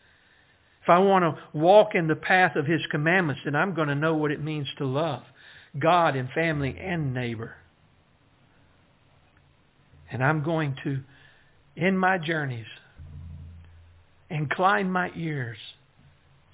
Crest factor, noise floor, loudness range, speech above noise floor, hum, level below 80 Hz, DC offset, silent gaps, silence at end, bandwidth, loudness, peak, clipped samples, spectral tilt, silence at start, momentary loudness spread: 22 dB; -61 dBFS; 10 LU; 37 dB; none; -56 dBFS; under 0.1%; none; 0.8 s; 4 kHz; -24 LUFS; -4 dBFS; under 0.1%; -10 dB/octave; 0.85 s; 19 LU